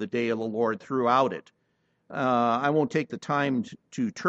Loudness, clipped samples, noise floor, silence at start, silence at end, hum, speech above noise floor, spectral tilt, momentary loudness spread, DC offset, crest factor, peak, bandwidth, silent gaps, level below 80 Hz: -26 LUFS; under 0.1%; -72 dBFS; 0 s; 0 s; none; 46 dB; -6.5 dB/octave; 8 LU; under 0.1%; 18 dB; -8 dBFS; 8.2 kHz; none; -74 dBFS